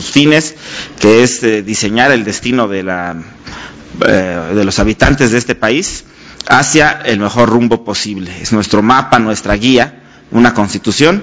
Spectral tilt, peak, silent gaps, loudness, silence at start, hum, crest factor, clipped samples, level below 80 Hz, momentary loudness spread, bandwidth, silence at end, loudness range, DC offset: -4.5 dB/octave; 0 dBFS; none; -11 LUFS; 0 s; none; 12 dB; 1%; -30 dBFS; 13 LU; 8 kHz; 0 s; 3 LU; under 0.1%